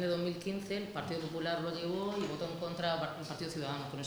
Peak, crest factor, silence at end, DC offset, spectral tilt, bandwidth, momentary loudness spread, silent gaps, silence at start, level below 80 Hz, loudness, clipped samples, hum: -20 dBFS; 18 dB; 0 s; under 0.1%; -5.5 dB/octave; over 20 kHz; 4 LU; none; 0 s; -68 dBFS; -38 LUFS; under 0.1%; none